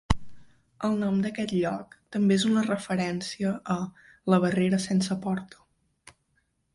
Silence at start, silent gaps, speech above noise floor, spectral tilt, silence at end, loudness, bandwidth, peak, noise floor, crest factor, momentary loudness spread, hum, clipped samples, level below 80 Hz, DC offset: 0.1 s; none; 46 dB; -6 dB/octave; 1.3 s; -27 LUFS; 11.5 kHz; -4 dBFS; -73 dBFS; 22 dB; 9 LU; none; under 0.1%; -48 dBFS; under 0.1%